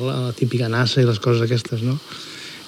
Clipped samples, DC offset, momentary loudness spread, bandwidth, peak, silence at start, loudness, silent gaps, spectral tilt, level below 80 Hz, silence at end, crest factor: under 0.1%; under 0.1%; 14 LU; 13 kHz; -6 dBFS; 0 s; -20 LUFS; none; -6.5 dB/octave; -64 dBFS; 0 s; 14 dB